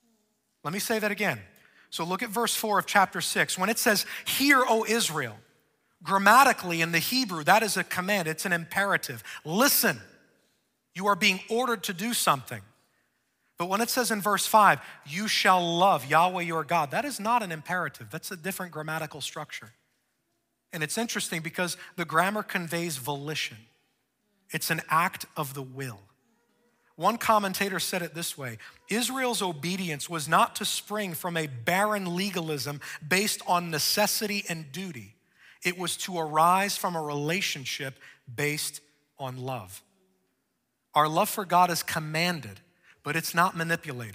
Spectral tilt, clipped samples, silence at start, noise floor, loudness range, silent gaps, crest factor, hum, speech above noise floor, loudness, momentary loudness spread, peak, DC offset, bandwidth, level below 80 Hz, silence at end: -3 dB/octave; under 0.1%; 0.65 s; -78 dBFS; 8 LU; none; 24 dB; none; 51 dB; -26 LUFS; 15 LU; -4 dBFS; under 0.1%; 16 kHz; -72 dBFS; 0 s